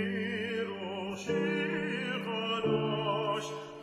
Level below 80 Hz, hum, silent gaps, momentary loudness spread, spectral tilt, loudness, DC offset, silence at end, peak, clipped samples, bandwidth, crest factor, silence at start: -68 dBFS; none; none; 7 LU; -5.5 dB/octave; -33 LUFS; under 0.1%; 0 s; -20 dBFS; under 0.1%; 13 kHz; 14 dB; 0 s